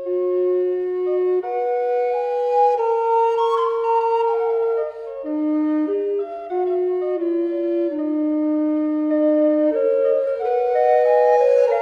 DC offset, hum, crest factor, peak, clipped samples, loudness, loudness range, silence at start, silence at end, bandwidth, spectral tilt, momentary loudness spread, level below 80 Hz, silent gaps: under 0.1%; none; 12 dB; -6 dBFS; under 0.1%; -20 LUFS; 4 LU; 0 s; 0 s; 6.8 kHz; -5.5 dB/octave; 7 LU; -66 dBFS; none